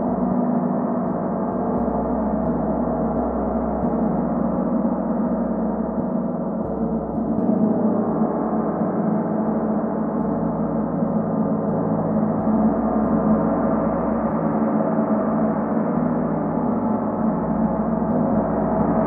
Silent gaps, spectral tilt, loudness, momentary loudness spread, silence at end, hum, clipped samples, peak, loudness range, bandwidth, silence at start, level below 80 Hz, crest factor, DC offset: none; -14 dB/octave; -22 LUFS; 4 LU; 0 s; none; under 0.1%; -6 dBFS; 2 LU; 2.5 kHz; 0 s; -42 dBFS; 14 dB; under 0.1%